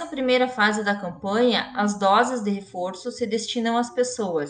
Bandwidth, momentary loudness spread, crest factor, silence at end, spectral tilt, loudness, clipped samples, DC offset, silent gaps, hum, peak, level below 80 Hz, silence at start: 10 kHz; 9 LU; 18 dB; 0 s; -4 dB/octave; -23 LUFS; under 0.1%; under 0.1%; none; none; -6 dBFS; -64 dBFS; 0 s